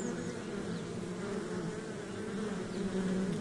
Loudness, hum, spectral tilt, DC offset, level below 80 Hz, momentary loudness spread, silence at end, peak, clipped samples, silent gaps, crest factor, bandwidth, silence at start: -38 LUFS; none; -6 dB/octave; under 0.1%; -60 dBFS; 6 LU; 0 s; -24 dBFS; under 0.1%; none; 14 dB; 11.5 kHz; 0 s